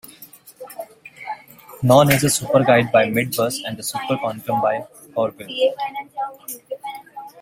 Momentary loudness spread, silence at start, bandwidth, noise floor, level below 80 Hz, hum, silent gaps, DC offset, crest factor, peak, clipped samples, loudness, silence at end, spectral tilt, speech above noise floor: 21 LU; 0.2 s; 16.5 kHz; -45 dBFS; -56 dBFS; none; none; under 0.1%; 20 dB; 0 dBFS; under 0.1%; -19 LUFS; 0 s; -4.5 dB/octave; 27 dB